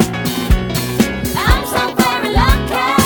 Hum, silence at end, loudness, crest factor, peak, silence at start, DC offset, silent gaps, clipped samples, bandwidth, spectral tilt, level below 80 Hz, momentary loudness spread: none; 0 s; -15 LUFS; 14 dB; 0 dBFS; 0 s; under 0.1%; none; under 0.1%; 19.5 kHz; -4.5 dB/octave; -20 dBFS; 3 LU